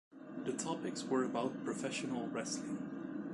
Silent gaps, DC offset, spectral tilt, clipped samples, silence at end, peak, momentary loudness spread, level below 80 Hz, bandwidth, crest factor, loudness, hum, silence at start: none; under 0.1%; -4.5 dB/octave; under 0.1%; 0 s; -22 dBFS; 7 LU; -78 dBFS; 11.5 kHz; 18 dB; -40 LUFS; none; 0.1 s